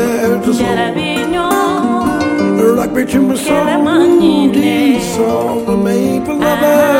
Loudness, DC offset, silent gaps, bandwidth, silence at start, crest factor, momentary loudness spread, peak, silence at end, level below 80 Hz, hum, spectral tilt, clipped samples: -12 LUFS; under 0.1%; none; 17 kHz; 0 s; 12 dB; 5 LU; 0 dBFS; 0 s; -40 dBFS; none; -5.5 dB/octave; under 0.1%